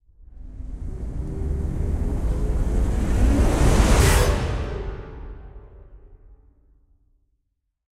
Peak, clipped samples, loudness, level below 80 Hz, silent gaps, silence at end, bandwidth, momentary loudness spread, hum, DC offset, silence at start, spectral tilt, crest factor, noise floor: -4 dBFS; under 0.1%; -23 LUFS; -24 dBFS; none; 2 s; 16 kHz; 22 LU; none; under 0.1%; 0.35 s; -5.5 dB/octave; 18 dB; -75 dBFS